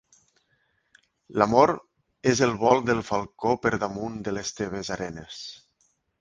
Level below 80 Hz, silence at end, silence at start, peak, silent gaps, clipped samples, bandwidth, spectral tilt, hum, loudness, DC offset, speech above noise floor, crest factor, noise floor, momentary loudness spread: -56 dBFS; 0.65 s; 1.3 s; -2 dBFS; none; under 0.1%; 10 kHz; -5 dB/octave; none; -25 LUFS; under 0.1%; 46 dB; 24 dB; -70 dBFS; 14 LU